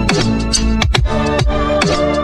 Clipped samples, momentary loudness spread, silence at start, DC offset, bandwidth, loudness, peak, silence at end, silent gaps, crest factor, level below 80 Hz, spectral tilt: under 0.1%; 1 LU; 0 s; under 0.1%; 12 kHz; -15 LUFS; 0 dBFS; 0 s; none; 12 dB; -20 dBFS; -4.5 dB/octave